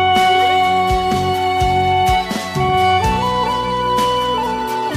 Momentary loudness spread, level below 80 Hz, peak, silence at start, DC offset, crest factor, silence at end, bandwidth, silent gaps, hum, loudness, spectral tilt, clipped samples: 6 LU; -32 dBFS; -4 dBFS; 0 s; under 0.1%; 12 dB; 0 s; 16 kHz; none; none; -16 LUFS; -4.5 dB/octave; under 0.1%